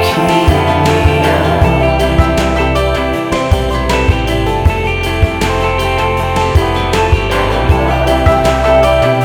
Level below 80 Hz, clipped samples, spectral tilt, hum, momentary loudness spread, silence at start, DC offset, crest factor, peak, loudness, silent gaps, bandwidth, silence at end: -18 dBFS; under 0.1%; -6 dB/octave; none; 4 LU; 0 s; under 0.1%; 10 dB; 0 dBFS; -12 LUFS; none; 18 kHz; 0 s